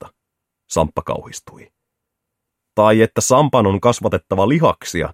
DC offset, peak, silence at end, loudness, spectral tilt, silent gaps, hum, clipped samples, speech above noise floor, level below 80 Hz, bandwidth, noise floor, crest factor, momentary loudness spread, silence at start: under 0.1%; 0 dBFS; 0 s; -16 LUFS; -5.5 dB/octave; none; none; under 0.1%; 63 dB; -44 dBFS; 16.5 kHz; -79 dBFS; 18 dB; 13 LU; 0.05 s